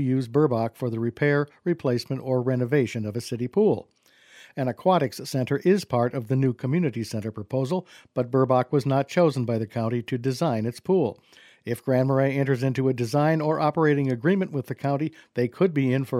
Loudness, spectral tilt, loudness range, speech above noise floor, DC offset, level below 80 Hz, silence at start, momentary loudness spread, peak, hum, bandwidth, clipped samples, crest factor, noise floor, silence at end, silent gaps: -25 LUFS; -7.5 dB/octave; 2 LU; 29 dB; under 0.1%; -66 dBFS; 0 s; 8 LU; -8 dBFS; none; 15 kHz; under 0.1%; 18 dB; -53 dBFS; 0 s; none